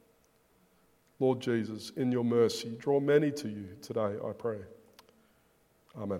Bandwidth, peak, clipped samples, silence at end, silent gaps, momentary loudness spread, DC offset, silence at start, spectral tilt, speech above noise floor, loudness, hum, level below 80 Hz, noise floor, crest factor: 16 kHz; -12 dBFS; under 0.1%; 0 s; none; 16 LU; under 0.1%; 1.2 s; -6.5 dB/octave; 37 dB; -31 LUFS; none; -74 dBFS; -68 dBFS; 20 dB